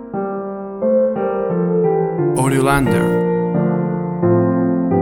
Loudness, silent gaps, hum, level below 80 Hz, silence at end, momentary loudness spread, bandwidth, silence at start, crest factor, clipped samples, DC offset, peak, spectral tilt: -17 LUFS; none; none; -42 dBFS; 0 s; 7 LU; 15.5 kHz; 0 s; 14 dB; under 0.1%; under 0.1%; -2 dBFS; -7.5 dB/octave